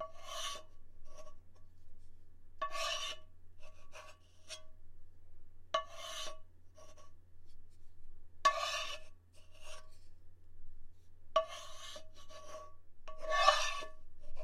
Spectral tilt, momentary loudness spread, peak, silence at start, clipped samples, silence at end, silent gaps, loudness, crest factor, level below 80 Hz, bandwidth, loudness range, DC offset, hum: -0.5 dB/octave; 26 LU; -10 dBFS; 0 s; under 0.1%; 0 s; none; -38 LUFS; 30 dB; -54 dBFS; 14.5 kHz; 10 LU; under 0.1%; none